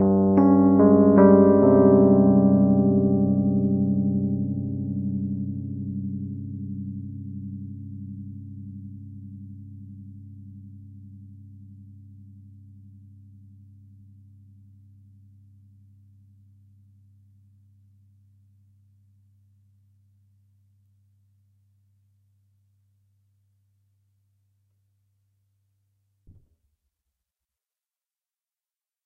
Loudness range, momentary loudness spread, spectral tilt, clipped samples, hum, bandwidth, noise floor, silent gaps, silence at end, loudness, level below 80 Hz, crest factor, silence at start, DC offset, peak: 28 LU; 27 LU; -14.5 dB/octave; under 0.1%; none; 2.3 kHz; under -90 dBFS; none; 17.8 s; -20 LUFS; -58 dBFS; 22 dB; 0 s; under 0.1%; -4 dBFS